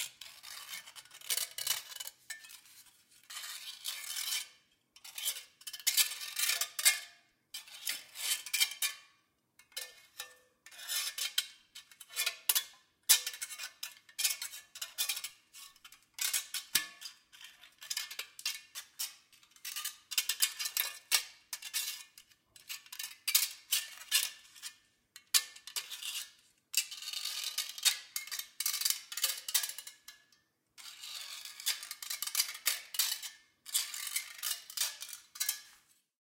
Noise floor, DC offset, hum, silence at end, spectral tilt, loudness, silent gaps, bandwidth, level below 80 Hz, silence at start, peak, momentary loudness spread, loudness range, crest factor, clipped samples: -73 dBFS; under 0.1%; none; 0.6 s; 4.5 dB/octave; -34 LUFS; none; 17 kHz; -88 dBFS; 0 s; -10 dBFS; 18 LU; 7 LU; 30 dB; under 0.1%